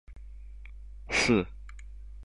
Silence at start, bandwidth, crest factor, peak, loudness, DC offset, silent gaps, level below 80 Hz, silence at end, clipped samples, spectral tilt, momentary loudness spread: 0.1 s; 11.5 kHz; 20 dB; -12 dBFS; -27 LUFS; 0.2%; none; -44 dBFS; 0 s; under 0.1%; -4 dB/octave; 25 LU